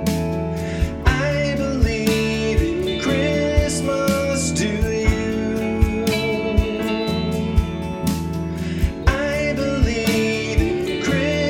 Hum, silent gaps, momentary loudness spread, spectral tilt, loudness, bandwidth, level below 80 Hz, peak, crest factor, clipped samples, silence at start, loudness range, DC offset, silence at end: none; none; 4 LU; -5.5 dB/octave; -21 LUFS; 17.5 kHz; -26 dBFS; 0 dBFS; 18 dB; under 0.1%; 0 s; 2 LU; under 0.1%; 0 s